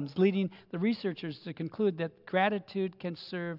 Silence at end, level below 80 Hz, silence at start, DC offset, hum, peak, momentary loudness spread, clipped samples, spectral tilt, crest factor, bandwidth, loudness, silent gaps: 0 s; -78 dBFS; 0 s; under 0.1%; none; -14 dBFS; 11 LU; under 0.1%; -9 dB/octave; 18 dB; 5.8 kHz; -32 LUFS; none